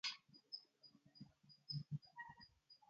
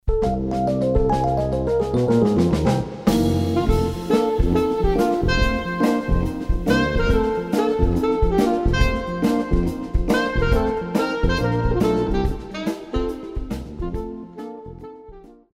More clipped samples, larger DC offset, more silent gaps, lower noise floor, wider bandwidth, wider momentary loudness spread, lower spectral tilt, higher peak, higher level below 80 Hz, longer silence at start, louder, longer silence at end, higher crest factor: neither; neither; neither; first, -71 dBFS vs -43 dBFS; second, 7.2 kHz vs 16 kHz; first, 18 LU vs 10 LU; second, -2.5 dB/octave vs -7 dB/octave; second, -32 dBFS vs -4 dBFS; second, -84 dBFS vs -26 dBFS; about the same, 0.05 s vs 0.05 s; second, -53 LUFS vs -21 LUFS; second, 0.05 s vs 0.35 s; first, 22 dB vs 16 dB